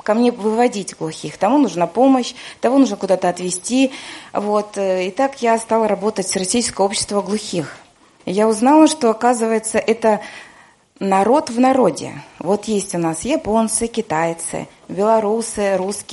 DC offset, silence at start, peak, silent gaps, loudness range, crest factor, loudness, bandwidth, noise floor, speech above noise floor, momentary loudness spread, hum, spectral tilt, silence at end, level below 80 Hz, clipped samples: under 0.1%; 0.05 s; -2 dBFS; none; 2 LU; 16 dB; -17 LUFS; 11.5 kHz; -48 dBFS; 31 dB; 12 LU; none; -4.5 dB/octave; 0 s; -54 dBFS; under 0.1%